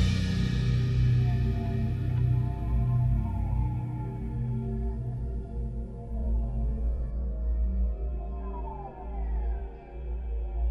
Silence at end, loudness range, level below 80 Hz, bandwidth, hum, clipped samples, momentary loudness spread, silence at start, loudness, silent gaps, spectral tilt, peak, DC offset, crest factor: 0 s; 7 LU; -32 dBFS; 7.2 kHz; none; under 0.1%; 11 LU; 0 s; -31 LUFS; none; -8 dB/octave; -14 dBFS; under 0.1%; 14 dB